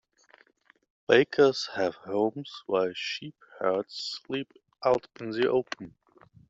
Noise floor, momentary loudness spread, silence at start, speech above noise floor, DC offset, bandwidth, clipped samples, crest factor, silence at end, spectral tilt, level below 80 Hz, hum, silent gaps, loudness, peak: -63 dBFS; 17 LU; 1.1 s; 36 dB; under 0.1%; 7.8 kHz; under 0.1%; 24 dB; 0.6 s; -5 dB/octave; -70 dBFS; none; none; -28 LUFS; -6 dBFS